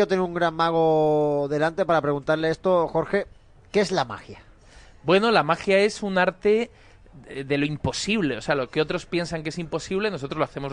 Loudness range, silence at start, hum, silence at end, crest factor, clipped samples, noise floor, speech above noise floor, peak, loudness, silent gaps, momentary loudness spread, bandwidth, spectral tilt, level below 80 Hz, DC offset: 4 LU; 0 s; none; 0 s; 18 dB; under 0.1%; -49 dBFS; 26 dB; -6 dBFS; -23 LUFS; none; 10 LU; 10 kHz; -5.5 dB/octave; -52 dBFS; under 0.1%